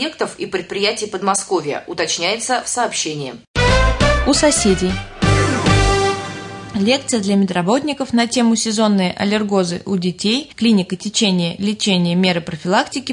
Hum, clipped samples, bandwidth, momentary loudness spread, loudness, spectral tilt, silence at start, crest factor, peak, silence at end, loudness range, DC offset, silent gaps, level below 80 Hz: none; under 0.1%; 11 kHz; 8 LU; -17 LUFS; -4 dB/octave; 0 s; 14 dB; -2 dBFS; 0 s; 3 LU; under 0.1%; 3.47-3.54 s; -30 dBFS